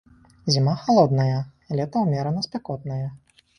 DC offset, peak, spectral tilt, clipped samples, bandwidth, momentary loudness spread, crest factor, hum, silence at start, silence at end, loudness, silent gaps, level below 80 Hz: under 0.1%; -4 dBFS; -6.5 dB/octave; under 0.1%; 9.8 kHz; 13 LU; 20 dB; none; 0.45 s; 0.4 s; -23 LUFS; none; -56 dBFS